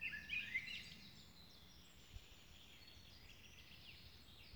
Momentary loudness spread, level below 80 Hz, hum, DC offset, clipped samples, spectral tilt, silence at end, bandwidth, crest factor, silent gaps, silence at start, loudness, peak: 18 LU; -68 dBFS; none; under 0.1%; under 0.1%; -2.5 dB/octave; 0 s; over 20 kHz; 22 dB; none; 0 s; -51 LUFS; -32 dBFS